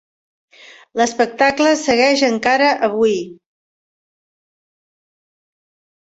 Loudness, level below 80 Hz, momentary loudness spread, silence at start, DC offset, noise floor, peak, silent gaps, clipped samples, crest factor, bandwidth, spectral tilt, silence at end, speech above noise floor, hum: -15 LUFS; -58 dBFS; 8 LU; 0.95 s; under 0.1%; under -90 dBFS; -2 dBFS; none; under 0.1%; 18 dB; 8.2 kHz; -3 dB/octave; 2.7 s; over 75 dB; none